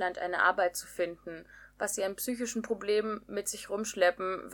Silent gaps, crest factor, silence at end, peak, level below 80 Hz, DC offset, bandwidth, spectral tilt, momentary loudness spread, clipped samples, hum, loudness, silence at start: none; 20 dB; 0 s; -12 dBFS; -66 dBFS; under 0.1%; 19 kHz; -2.5 dB/octave; 9 LU; under 0.1%; 50 Hz at -65 dBFS; -32 LUFS; 0 s